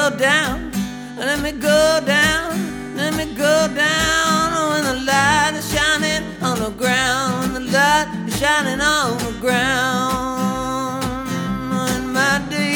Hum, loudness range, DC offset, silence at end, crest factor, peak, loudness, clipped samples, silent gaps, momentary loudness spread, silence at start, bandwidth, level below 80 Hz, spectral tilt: none; 3 LU; under 0.1%; 0 s; 16 dB; -2 dBFS; -18 LUFS; under 0.1%; none; 9 LU; 0 s; over 20 kHz; -40 dBFS; -3.5 dB/octave